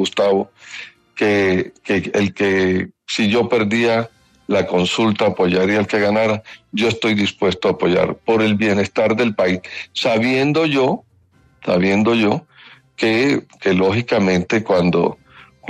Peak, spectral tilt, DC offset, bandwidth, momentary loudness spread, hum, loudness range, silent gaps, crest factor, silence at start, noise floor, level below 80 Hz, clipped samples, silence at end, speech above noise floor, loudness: -4 dBFS; -5.5 dB/octave; under 0.1%; 11 kHz; 8 LU; none; 1 LU; none; 14 dB; 0 s; -55 dBFS; -54 dBFS; under 0.1%; 0 s; 38 dB; -17 LUFS